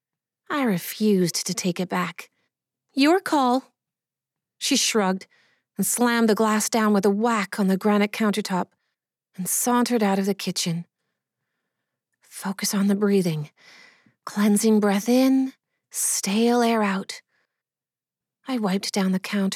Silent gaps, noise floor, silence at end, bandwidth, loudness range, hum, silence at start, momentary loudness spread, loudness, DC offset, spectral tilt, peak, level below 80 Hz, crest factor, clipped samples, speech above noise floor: none; under -90 dBFS; 0 s; 17 kHz; 5 LU; none; 0.5 s; 13 LU; -22 LUFS; under 0.1%; -4 dB/octave; -6 dBFS; under -90 dBFS; 16 dB; under 0.1%; over 68 dB